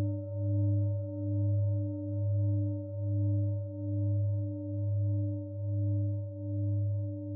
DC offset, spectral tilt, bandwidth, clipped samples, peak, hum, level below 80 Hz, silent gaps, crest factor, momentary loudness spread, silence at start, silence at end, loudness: under 0.1%; -15 dB/octave; 1 kHz; under 0.1%; -22 dBFS; none; -64 dBFS; none; 10 dB; 6 LU; 0 s; 0 s; -33 LUFS